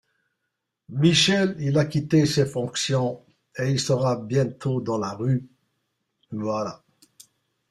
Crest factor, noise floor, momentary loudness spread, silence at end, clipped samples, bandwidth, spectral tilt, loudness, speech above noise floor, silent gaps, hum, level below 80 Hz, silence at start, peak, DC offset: 20 dB; -80 dBFS; 12 LU; 0.95 s; under 0.1%; 13 kHz; -5 dB/octave; -23 LUFS; 58 dB; none; none; -58 dBFS; 0.9 s; -6 dBFS; under 0.1%